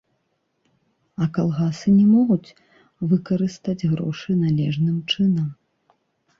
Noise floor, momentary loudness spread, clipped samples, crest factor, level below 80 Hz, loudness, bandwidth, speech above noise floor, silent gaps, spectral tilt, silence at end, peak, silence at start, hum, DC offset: -71 dBFS; 9 LU; under 0.1%; 14 dB; -58 dBFS; -21 LUFS; 7.4 kHz; 52 dB; none; -7.5 dB/octave; 0.85 s; -8 dBFS; 1.2 s; none; under 0.1%